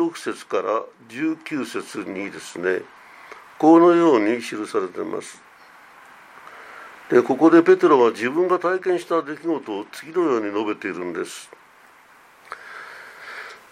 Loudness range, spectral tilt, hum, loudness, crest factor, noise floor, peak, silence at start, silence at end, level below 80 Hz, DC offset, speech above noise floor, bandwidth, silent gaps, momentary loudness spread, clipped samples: 9 LU; -5.5 dB/octave; none; -20 LUFS; 20 dB; -51 dBFS; -2 dBFS; 0 s; 0.15 s; -76 dBFS; under 0.1%; 31 dB; 14 kHz; none; 24 LU; under 0.1%